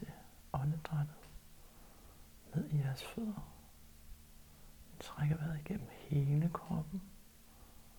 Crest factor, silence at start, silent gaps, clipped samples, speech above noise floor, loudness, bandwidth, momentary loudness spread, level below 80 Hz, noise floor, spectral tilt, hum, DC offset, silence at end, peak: 18 dB; 0 s; none; under 0.1%; 22 dB; -39 LUFS; over 20 kHz; 24 LU; -58 dBFS; -59 dBFS; -7.5 dB/octave; none; under 0.1%; 0 s; -24 dBFS